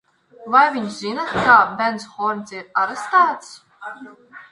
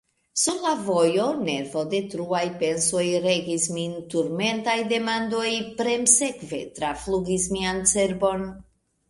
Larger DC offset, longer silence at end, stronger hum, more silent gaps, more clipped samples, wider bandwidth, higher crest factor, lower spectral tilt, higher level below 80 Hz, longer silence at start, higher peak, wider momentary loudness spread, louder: neither; second, 0.1 s vs 0.45 s; neither; neither; neither; about the same, 11.5 kHz vs 11.5 kHz; about the same, 20 dB vs 22 dB; about the same, -4 dB/octave vs -3 dB/octave; about the same, -58 dBFS vs -54 dBFS; about the same, 0.4 s vs 0.35 s; about the same, 0 dBFS vs -2 dBFS; first, 22 LU vs 8 LU; first, -18 LUFS vs -24 LUFS